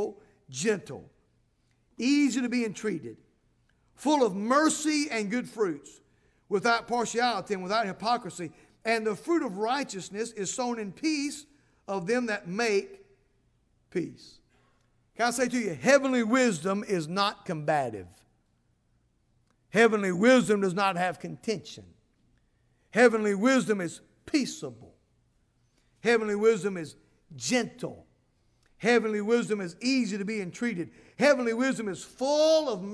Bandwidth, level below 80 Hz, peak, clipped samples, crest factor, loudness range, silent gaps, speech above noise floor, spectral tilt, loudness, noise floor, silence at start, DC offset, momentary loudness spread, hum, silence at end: 11 kHz; -70 dBFS; -8 dBFS; under 0.1%; 20 dB; 5 LU; none; 43 dB; -4 dB/octave; -27 LUFS; -70 dBFS; 0 s; under 0.1%; 13 LU; none; 0 s